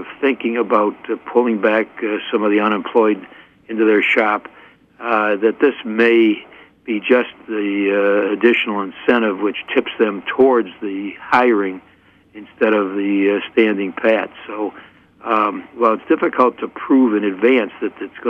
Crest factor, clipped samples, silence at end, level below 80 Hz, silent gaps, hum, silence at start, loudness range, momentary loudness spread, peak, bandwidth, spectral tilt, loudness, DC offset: 16 dB; under 0.1%; 0 s; -64 dBFS; none; none; 0 s; 2 LU; 11 LU; -2 dBFS; 5.6 kHz; -7 dB/octave; -17 LUFS; under 0.1%